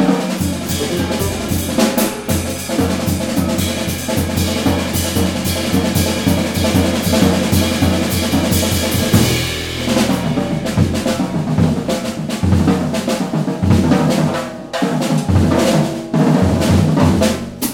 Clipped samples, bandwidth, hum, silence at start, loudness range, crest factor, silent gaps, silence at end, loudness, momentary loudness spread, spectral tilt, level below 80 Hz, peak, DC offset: under 0.1%; 17.5 kHz; none; 0 s; 3 LU; 16 dB; none; 0 s; -16 LUFS; 6 LU; -5 dB/octave; -34 dBFS; 0 dBFS; under 0.1%